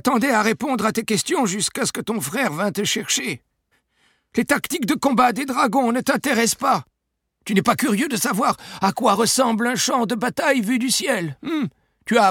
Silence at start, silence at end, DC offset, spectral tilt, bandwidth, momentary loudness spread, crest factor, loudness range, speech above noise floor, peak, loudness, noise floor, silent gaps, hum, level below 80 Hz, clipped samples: 0.05 s; 0 s; under 0.1%; -3.5 dB/octave; 18.5 kHz; 7 LU; 16 dB; 3 LU; 55 dB; -4 dBFS; -20 LUFS; -75 dBFS; none; none; -60 dBFS; under 0.1%